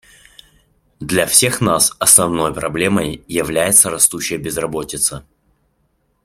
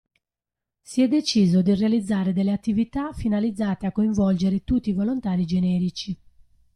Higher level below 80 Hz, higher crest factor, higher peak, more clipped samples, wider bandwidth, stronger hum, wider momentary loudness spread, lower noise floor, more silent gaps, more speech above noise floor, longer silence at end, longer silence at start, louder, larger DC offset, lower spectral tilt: about the same, -46 dBFS vs -46 dBFS; about the same, 18 dB vs 14 dB; first, 0 dBFS vs -10 dBFS; neither; first, 16.5 kHz vs 11 kHz; neither; first, 12 LU vs 8 LU; second, -64 dBFS vs -87 dBFS; neither; second, 48 dB vs 66 dB; first, 1.05 s vs 0.6 s; about the same, 1 s vs 0.9 s; first, -14 LUFS vs -23 LUFS; neither; second, -2.5 dB/octave vs -7 dB/octave